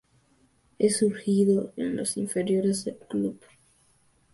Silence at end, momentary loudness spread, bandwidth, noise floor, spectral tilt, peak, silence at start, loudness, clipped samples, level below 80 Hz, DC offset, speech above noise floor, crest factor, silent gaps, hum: 0.95 s; 8 LU; 12 kHz; -64 dBFS; -5.5 dB/octave; -10 dBFS; 0.8 s; -26 LUFS; under 0.1%; -66 dBFS; under 0.1%; 39 dB; 16 dB; none; none